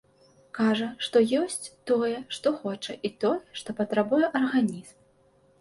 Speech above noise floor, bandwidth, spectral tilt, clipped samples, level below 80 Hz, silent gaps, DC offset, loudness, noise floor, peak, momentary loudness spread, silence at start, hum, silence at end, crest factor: 36 dB; 11.5 kHz; -4.5 dB/octave; under 0.1%; -70 dBFS; none; under 0.1%; -27 LUFS; -62 dBFS; -10 dBFS; 10 LU; 0.55 s; none; 0.7 s; 18 dB